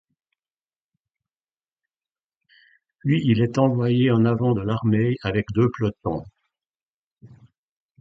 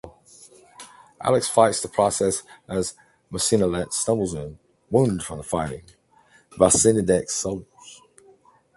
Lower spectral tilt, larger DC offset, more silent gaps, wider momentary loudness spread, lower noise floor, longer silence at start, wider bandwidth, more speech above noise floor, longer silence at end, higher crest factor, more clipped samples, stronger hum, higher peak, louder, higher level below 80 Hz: first, -8.5 dB/octave vs -4.5 dB/octave; neither; first, 6.66-6.70 s, 6.76-7.16 s vs none; second, 9 LU vs 14 LU; first, under -90 dBFS vs -57 dBFS; first, 3.05 s vs 0.05 s; second, 7.6 kHz vs 12 kHz; first, over 70 dB vs 36 dB; about the same, 0.75 s vs 0.8 s; about the same, 20 dB vs 24 dB; neither; neither; second, -4 dBFS vs 0 dBFS; about the same, -22 LUFS vs -22 LUFS; about the same, -52 dBFS vs -48 dBFS